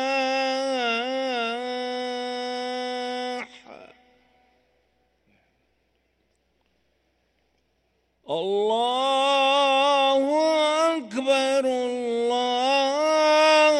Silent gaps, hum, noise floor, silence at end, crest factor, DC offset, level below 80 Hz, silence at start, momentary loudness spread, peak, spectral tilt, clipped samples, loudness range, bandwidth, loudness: none; none; -70 dBFS; 0 s; 16 dB; under 0.1%; -72 dBFS; 0 s; 10 LU; -8 dBFS; -2 dB/octave; under 0.1%; 14 LU; 12 kHz; -23 LUFS